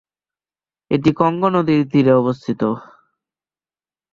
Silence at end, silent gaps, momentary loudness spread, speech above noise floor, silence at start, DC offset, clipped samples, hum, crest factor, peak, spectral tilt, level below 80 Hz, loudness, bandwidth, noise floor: 1.35 s; none; 8 LU; over 74 dB; 0.9 s; under 0.1%; under 0.1%; none; 18 dB; -2 dBFS; -8.5 dB/octave; -54 dBFS; -17 LUFS; 7.2 kHz; under -90 dBFS